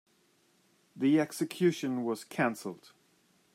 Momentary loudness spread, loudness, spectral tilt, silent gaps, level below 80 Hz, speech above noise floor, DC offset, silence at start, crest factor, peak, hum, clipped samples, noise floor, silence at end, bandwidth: 14 LU; -31 LUFS; -5.5 dB/octave; none; -84 dBFS; 39 dB; under 0.1%; 0.95 s; 16 dB; -16 dBFS; none; under 0.1%; -69 dBFS; 0.8 s; 16 kHz